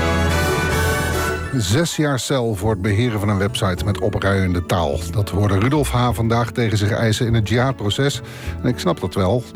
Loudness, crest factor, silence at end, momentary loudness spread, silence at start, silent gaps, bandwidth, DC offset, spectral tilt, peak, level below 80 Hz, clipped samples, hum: -19 LUFS; 12 dB; 0 s; 4 LU; 0 s; none; 19.5 kHz; under 0.1%; -5.5 dB/octave; -8 dBFS; -36 dBFS; under 0.1%; none